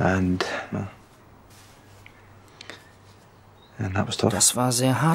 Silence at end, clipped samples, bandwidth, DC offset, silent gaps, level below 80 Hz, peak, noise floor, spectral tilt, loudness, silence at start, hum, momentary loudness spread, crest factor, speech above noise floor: 0 s; under 0.1%; 16 kHz; under 0.1%; none; -56 dBFS; -6 dBFS; -52 dBFS; -4 dB/octave; -23 LUFS; 0 s; none; 24 LU; 22 dB; 29 dB